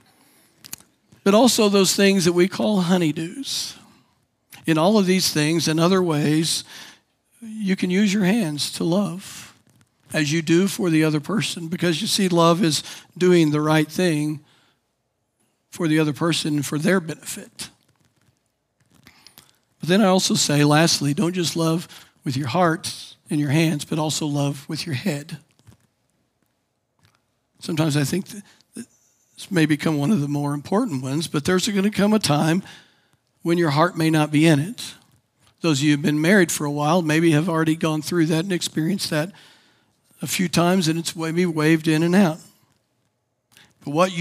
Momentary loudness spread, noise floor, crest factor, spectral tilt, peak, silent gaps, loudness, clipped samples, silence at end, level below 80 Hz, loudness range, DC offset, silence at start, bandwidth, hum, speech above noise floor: 16 LU; -73 dBFS; 20 dB; -5 dB/octave; -2 dBFS; none; -20 LUFS; under 0.1%; 0 s; -68 dBFS; 7 LU; under 0.1%; 0.7 s; 16 kHz; none; 53 dB